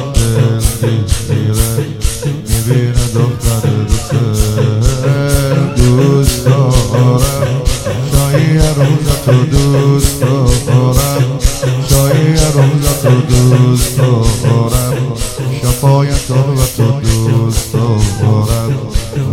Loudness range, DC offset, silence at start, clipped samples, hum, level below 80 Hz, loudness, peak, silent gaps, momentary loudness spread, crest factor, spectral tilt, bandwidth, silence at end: 3 LU; under 0.1%; 0 s; 0.8%; none; -20 dBFS; -12 LUFS; 0 dBFS; none; 6 LU; 10 dB; -6 dB/octave; 16.5 kHz; 0 s